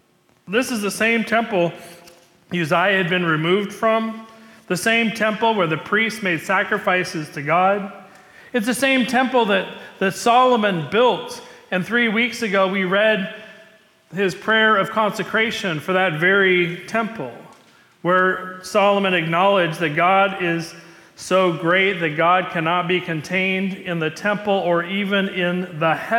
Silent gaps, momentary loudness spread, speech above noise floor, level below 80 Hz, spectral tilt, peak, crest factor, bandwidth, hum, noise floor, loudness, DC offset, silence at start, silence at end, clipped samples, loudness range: none; 10 LU; 33 dB; -66 dBFS; -4.5 dB/octave; -6 dBFS; 14 dB; 18 kHz; none; -52 dBFS; -19 LUFS; under 0.1%; 0.45 s; 0 s; under 0.1%; 2 LU